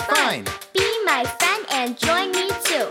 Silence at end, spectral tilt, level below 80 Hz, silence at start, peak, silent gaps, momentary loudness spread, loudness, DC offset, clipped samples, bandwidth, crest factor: 0 s; -2 dB/octave; -52 dBFS; 0 s; -6 dBFS; none; 4 LU; -20 LUFS; under 0.1%; under 0.1%; 18 kHz; 16 dB